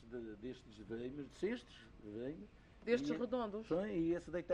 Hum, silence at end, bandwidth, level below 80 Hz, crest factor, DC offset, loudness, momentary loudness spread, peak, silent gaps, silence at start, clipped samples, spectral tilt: none; 0 s; 9.4 kHz; -64 dBFS; 20 dB; under 0.1%; -42 LUFS; 16 LU; -22 dBFS; none; 0 s; under 0.1%; -6.5 dB/octave